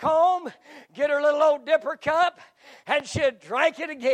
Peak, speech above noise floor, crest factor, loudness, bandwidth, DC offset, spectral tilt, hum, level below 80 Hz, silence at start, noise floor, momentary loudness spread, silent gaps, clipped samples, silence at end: -8 dBFS; 22 dB; 16 dB; -23 LUFS; 9.8 kHz; under 0.1%; -4 dB/octave; none; -60 dBFS; 0 s; -47 dBFS; 8 LU; none; under 0.1%; 0 s